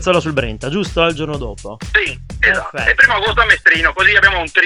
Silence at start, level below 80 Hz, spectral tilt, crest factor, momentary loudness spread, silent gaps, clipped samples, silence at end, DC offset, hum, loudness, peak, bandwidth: 0 s; -30 dBFS; -4 dB/octave; 14 dB; 12 LU; none; under 0.1%; 0 s; under 0.1%; none; -13 LUFS; 0 dBFS; 11 kHz